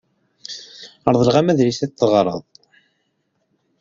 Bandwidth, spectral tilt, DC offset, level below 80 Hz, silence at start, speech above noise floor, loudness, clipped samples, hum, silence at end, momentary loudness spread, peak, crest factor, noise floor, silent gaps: 7.6 kHz; -6.5 dB/octave; under 0.1%; -54 dBFS; 0.5 s; 53 dB; -17 LUFS; under 0.1%; none; 1.4 s; 18 LU; 0 dBFS; 20 dB; -69 dBFS; none